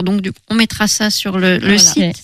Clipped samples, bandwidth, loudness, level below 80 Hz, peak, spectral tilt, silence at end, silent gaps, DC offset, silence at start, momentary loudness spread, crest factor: under 0.1%; 15.5 kHz; -12 LUFS; -42 dBFS; 0 dBFS; -3 dB/octave; 0.05 s; none; under 0.1%; 0 s; 10 LU; 14 dB